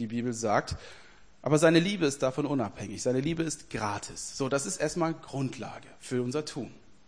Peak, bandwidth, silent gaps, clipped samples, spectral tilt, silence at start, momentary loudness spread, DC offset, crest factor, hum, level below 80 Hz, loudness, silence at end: -8 dBFS; 10.5 kHz; none; under 0.1%; -5 dB/octave; 0 s; 16 LU; 0.2%; 22 dB; none; -56 dBFS; -30 LUFS; 0.35 s